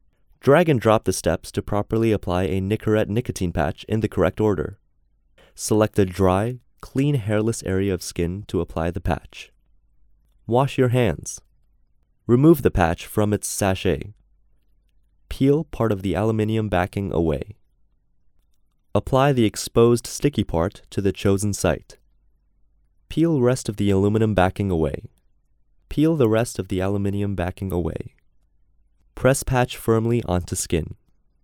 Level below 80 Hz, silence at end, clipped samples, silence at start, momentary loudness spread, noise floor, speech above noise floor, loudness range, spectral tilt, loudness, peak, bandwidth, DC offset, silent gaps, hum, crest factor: -40 dBFS; 0.5 s; under 0.1%; 0.45 s; 11 LU; -62 dBFS; 41 dB; 4 LU; -6 dB/octave; -22 LUFS; -2 dBFS; 18 kHz; under 0.1%; none; none; 20 dB